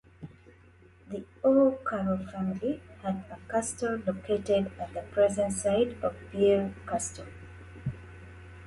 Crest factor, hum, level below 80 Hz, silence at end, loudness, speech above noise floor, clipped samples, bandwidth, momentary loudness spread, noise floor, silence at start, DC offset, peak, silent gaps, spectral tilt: 18 dB; none; -54 dBFS; 0 s; -29 LUFS; 28 dB; under 0.1%; 11.5 kHz; 22 LU; -57 dBFS; 0.2 s; under 0.1%; -12 dBFS; none; -5.5 dB/octave